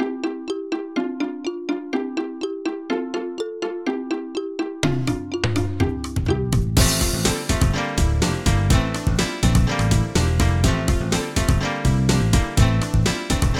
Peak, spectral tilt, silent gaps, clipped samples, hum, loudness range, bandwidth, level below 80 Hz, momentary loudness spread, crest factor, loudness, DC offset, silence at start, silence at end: -2 dBFS; -5 dB/octave; none; under 0.1%; none; 7 LU; 18 kHz; -26 dBFS; 9 LU; 18 dB; -22 LUFS; under 0.1%; 0 s; 0 s